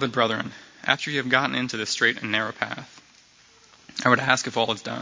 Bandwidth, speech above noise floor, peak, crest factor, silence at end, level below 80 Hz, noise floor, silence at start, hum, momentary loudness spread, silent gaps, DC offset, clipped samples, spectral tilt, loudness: 7.8 kHz; 31 dB; -2 dBFS; 24 dB; 0 s; -66 dBFS; -55 dBFS; 0 s; none; 11 LU; none; under 0.1%; under 0.1%; -3.5 dB/octave; -23 LUFS